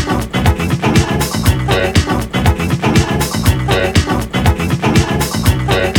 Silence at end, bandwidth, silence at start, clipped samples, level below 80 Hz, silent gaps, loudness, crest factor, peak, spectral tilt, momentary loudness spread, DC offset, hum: 0 s; over 20 kHz; 0 s; under 0.1%; -22 dBFS; none; -14 LUFS; 14 dB; 0 dBFS; -5.5 dB/octave; 2 LU; under 0.1%; none